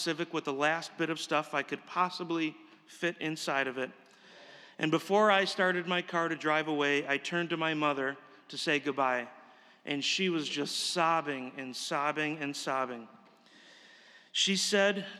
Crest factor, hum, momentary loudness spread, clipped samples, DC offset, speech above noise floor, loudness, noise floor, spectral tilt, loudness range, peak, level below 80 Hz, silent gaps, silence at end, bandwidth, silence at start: 20 dB; none; 11 LU; under 0.1%; under 0.1%; 27 dB; -31 LUFS; -59 dBFS; -3.5 dB/octave; 5 LU; -12 dBFS; under -90 dBFS; none; 0 s; 14.5 kHz; 0 s